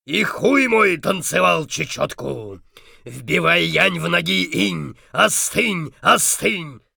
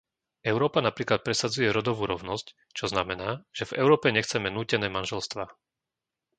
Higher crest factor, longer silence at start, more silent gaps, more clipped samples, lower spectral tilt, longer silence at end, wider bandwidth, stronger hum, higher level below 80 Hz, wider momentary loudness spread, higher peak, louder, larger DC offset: second, 16 dB vs 22 dB; second, 0.1 s vs 0.45 s; neither; neither; second, -3 dB/octave vs -4.5 dB/octave; second, 0.2 s vs 0.85 s; first, over 20 kHz vs 9.4 kHz; neither; first, -52 dBFS vs -58 dBFS; about the same, 13 LU vs 12 LU; about the same, -4 dBFS vs -6 dBFS; first, -17 LUFS vs -27 LUFS; neither